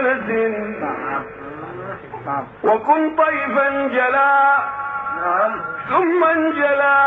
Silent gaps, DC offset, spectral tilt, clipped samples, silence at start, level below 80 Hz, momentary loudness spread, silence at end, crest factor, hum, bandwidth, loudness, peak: none; under 0.1%; -8 dB/octave; under 0.1%; 0 s; -58 dBFS; 16 LU; 0 s; 14 dB; none; 4.5 kHz; -18 LUFS; -4 dBFS